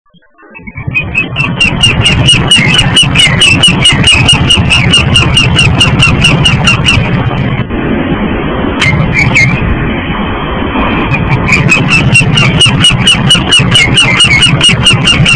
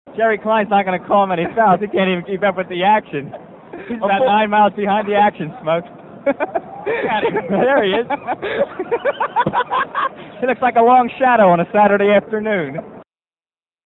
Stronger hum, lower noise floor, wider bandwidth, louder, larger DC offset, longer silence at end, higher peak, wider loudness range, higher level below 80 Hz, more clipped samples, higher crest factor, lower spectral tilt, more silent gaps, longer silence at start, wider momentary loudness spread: neither; second, -38 dBFS vs under -90 dBFS; first, 11 kHz vs 4.1 kHz; first, -5 LUFS vs -16 LUFS; first, 0.9% vs under 0.1%; second, 0 s vs 0.85 s; about the same, 0 dBFS vs 0 dBFS; about the same, 6 LU vs 4 LU; first, -20 dBFS vs -56 dBFS; first, 3% vs under 0.1%; second, 8 dB vs 16 dB; second, -3.5 dB/octave vs -8.5 dB/octave; neither; first, 0.55 s vs 0.05 s; about the same, 9 LU vs 11 LU